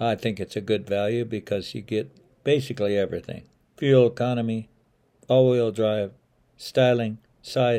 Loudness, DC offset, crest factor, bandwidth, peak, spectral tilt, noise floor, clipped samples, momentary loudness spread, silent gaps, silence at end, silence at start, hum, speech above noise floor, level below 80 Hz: -24 LUFS; under 0.1%; 18 dB; 15 kHz; -6 dBFS; -7 dB/octave; -64 dBFS; under 0.1%; 14 LU; none; 0 s; 0 s; none; 41 dB; -62 dBFS